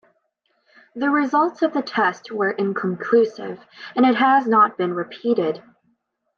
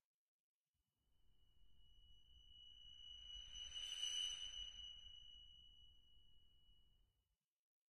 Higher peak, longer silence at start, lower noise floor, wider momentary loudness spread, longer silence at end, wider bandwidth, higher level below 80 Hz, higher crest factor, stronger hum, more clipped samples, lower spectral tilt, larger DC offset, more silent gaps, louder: first, -6 dBFS vs -34 dBFS; first, 0.95 s vs 0 s; second, -69 dBFS vs under -90 dBFS; second, 13 LU vs 22 LU; first, 0.8 s vs 0.05 s; second, 6.8 kHz vs 14 kHz; about the same, -76 dBFS vs -72 dBFS; second, 16 dB vs 22 dB; neither; neither; first, -6.5 dB/octave vs 1.5 dB/octave; neither; second, none vs 0.05-0.72 s, 7.52-7.82 s; first, -20 LUFS vs -49 LUFS